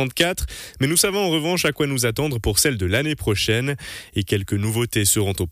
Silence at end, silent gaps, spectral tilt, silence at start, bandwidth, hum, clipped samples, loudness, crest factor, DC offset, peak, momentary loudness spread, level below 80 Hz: 0 s; none; -3.5 dB/octave; 0 s; 15.5 kHz; none; under 0.1%; -20 LUFS; 16 dB; under 0.1%; -6 dBFS; 9 LU; -38 dBFS